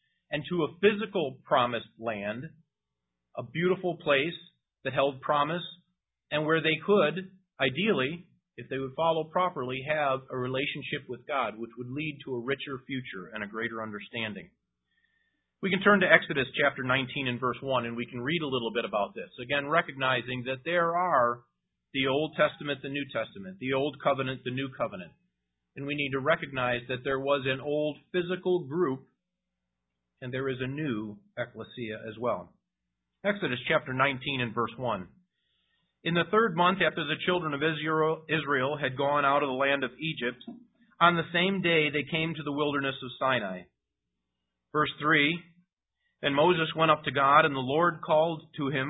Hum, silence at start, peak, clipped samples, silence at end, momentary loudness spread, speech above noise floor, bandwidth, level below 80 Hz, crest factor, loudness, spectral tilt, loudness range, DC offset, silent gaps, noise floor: none; 0.3 s; -4 dBFS; under 0.1%; 0 s; 13 LU; 58 dB; 4 kHz; -66 dBFS; 26 dB; -29 LUFS; -9.5 dB/octave; 7 LU; under 0.1%; 45.73-45.77 s; -87 dBFS